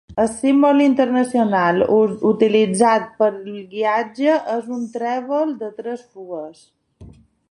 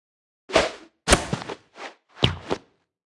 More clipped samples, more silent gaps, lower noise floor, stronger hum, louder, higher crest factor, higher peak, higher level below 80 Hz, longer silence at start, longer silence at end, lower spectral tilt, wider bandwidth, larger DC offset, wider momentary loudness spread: neither; neither; about the same, -44 dBFS vs -47 dBFS; neither; first, -18 LUFS vs -24 LUFS; second, 16 dB vs 26 dB; about the same, -2 dBFS vs 0 dBFS; second, -56 dBFS vs -40 dBFS; second, 0.1 s vs 0.5 s; about the same, 0.45 s vs 0.55 s; first, -5.5 dB/octave vs -3.5 dB/octave; about the same, 11.5 kHz vs 12 kHz; neither; second, 16 LU vs 19 LU